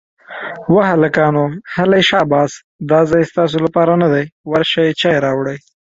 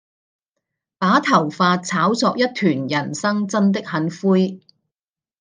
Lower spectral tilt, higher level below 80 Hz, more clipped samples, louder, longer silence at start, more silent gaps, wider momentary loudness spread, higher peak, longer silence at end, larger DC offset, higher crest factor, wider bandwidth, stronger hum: about the same, -6 dB/octave vs -5.5 dB/octave; first, -50 dBFS vs -68 dBFS; neither; first, -14 LUFS vs -19 LUFS; second, 0.3 s vs 1 s; first, 2.64-2.79 s, 4.32-4.44 s vs none; first, 11 LU vs 6 LU; about the same, 0 dBFS vs -2 dBFS; second, 0.25 s vs 0.85 s; neither; about the same, 14 dB vs 18 dB; second, 7.8 kHz vs 9.8 kHz; neither